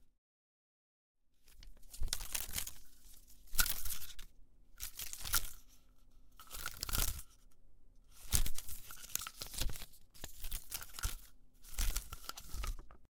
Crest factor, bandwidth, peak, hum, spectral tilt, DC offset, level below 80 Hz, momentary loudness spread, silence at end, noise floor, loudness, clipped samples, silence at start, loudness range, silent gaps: 30 dB; 18 kHz; -10 dBFS; none; -1 dB/octave; under 0.1%; -46 dBFS; 23 LU; 0.1 s; -59 dBFS; -41 LUFS; under 0.1%; 0 s; 5 LU; 0.18-1.15 s